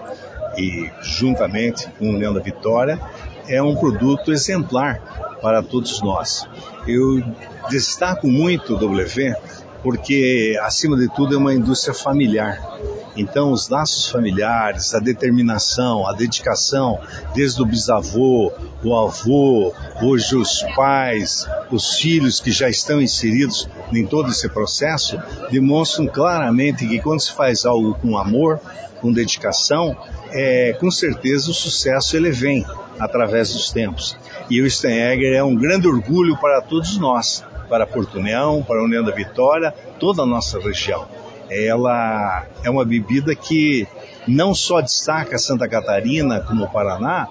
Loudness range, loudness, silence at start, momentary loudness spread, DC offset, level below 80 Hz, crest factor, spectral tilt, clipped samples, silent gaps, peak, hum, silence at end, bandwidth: 3 LU; -18 LUFS; 0 s; 8 LU; under 0.1%; -38 dBFS; 16 dB; -4.5 dB/octave; under 0.1%; none; -2 dBFS; none; 0 s; 8 kHz